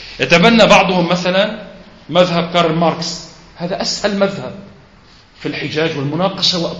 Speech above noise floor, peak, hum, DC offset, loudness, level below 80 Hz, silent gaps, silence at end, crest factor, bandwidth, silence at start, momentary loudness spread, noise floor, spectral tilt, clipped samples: 31 dB; 0 dBFS; none; under 0.1%; -14 LUFS; -44 dBFS; none; 0 s; 16 dB; 8.2 kHz; 0 s; 18 LU; -45 dBFS; -4.5 dB/octave; under 0.1%